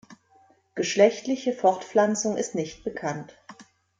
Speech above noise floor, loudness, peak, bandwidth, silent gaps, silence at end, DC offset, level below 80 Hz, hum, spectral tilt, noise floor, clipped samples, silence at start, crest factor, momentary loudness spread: 36 dB; -25 LUFS; -6 dBFS; 9.4 kHz; none; 0.4 s; under 0.1%; -66 dBFS; none; -4 dB/octave; -60 dBFS; under 0.1%; 0.1 s; 20 dB; 13 LU